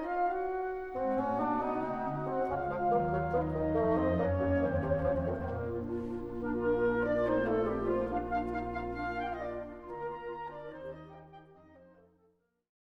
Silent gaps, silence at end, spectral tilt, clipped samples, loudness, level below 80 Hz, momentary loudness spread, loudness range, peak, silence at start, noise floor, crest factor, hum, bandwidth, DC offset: none; 0.95 s; -9.5 dB/octave; under 0.1%; -33 LUFS; -50 dBFS; 12 LU; 10 LU; -18 dBFS; 0 s; -72 dBFS; 16 dB; none; 6.4 kHz; under 0.1%